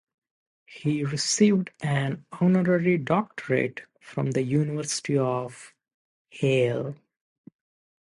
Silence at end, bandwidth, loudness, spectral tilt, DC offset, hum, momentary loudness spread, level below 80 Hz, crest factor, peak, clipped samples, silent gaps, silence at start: 1.05 s; 11.5 kHz; -25 LUFS; -5.5 dB/octave; under 0.1%; none; 11 LU; -68 dBFS; 18 dB; -8 dBFS; under 0.1%; 5.94-6.25 s; 0.7 s